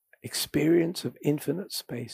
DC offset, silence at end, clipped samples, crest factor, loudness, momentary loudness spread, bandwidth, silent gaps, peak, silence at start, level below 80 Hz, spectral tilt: under 0.1%; 0 s; under 0.1%; 16 dB; -28 LUFS; 10 LU; 15.5 kHz; none; -12 dBFS; 0.25 s; -62 dBFS; -5 dB/octave